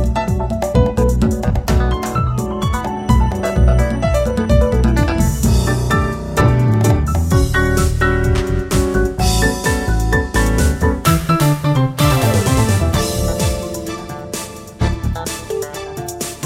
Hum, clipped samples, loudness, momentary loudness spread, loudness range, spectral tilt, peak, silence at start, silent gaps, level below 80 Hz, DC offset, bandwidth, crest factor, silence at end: none; under 0.1%; -16 LUFS; 9 LU; 3 LU; -5.5 dB/octave; 0 dBFS; 0 s; none; -20 dBFS; under 0.1%; 16.5 kHz; 14 dB; 0 s